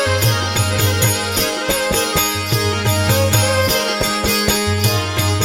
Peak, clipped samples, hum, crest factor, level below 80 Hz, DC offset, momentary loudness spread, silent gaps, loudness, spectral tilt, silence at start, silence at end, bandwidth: -2 dBFS; under 0.1%; none; 14 dB; -36 dBFS; under 0.1%; 3 LU; none; -16 LUFS; -3.5 dB/octave; 0 s; 0 s; 17 kHz